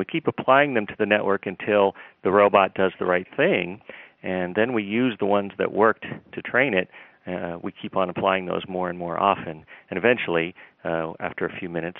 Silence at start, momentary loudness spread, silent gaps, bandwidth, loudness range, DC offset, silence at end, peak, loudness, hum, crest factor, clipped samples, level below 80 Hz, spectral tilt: 0 s; 14 LU; none; 4 kHz; 5 LU; under 0.1%; 0 s; -2 dBFS; -23 LUFS; none; 22 dB; under 0.1%; -64 dBFS; -3.5 dB/octave